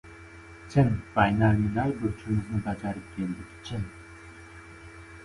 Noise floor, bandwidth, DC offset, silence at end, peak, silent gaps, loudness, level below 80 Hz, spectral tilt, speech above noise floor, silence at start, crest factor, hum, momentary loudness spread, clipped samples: -47 dBFS; 11.5 kHz; under 0.1%; 0 s; -8 dBFS; none; -28 LUFS; -46 dBFS; -8 dB/octave; 21 dB; 0.05 s; 20 dB; none; 23 LU; under 0.1%